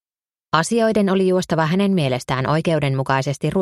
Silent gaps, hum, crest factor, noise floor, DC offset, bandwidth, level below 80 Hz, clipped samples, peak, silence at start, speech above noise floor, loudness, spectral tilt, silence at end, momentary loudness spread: none; none; 18 dB; under -90 dBFS; under 0.1%; 13 kHz; -50 dBFS; under 0.1%; 0 dBFS; 0.55 s; over 72 dB; -19 LUFS; -6 dB/octave; 0 s; 4 LU